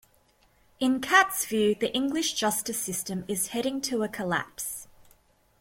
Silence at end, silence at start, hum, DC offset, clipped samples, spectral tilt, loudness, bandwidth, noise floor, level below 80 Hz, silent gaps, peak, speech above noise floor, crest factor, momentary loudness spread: 0.75 s; 0.8 s; none; under 0.1%; under 0.1%; -2.5 dB/octave; -27 LUFS; 16.5 kHz; -64 dBFS; -62 dBFS; none; -6 dBFS; 37 dB; 22 dB; 11 LU